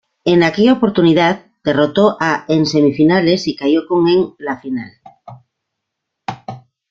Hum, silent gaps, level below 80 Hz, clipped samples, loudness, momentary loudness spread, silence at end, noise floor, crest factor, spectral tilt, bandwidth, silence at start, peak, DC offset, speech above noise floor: none; none; -54 dBFS; under 0.1%; -14 LUFS; 16 LU; 0.35 s; -77 dBFS; 14 dB; -6.5 dB/octave; 7.4 kHz; 0.25 s; 0 dBFS; under 0.1%; 64 dB